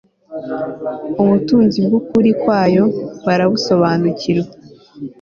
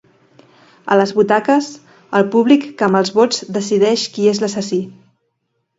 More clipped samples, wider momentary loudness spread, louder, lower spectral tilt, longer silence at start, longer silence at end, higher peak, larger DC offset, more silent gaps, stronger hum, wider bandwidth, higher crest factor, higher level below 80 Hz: neither; first, 14 LU vs 8 LU; about the same, -15 LUFS vs -15 LUFS; first, -7 dB/octave vs -5 dB/octave; second, 0.3 s vs 0.85 s; second, 0.1 s vs 0.85 s; about the same, -2 dBFS vs 0 dBFS; neither; neither; neither; second, 7.2 kHz vs 8 kHz; about the same, 12 dB vs 16 dB; first, -52 dBFS vs -64 dBFS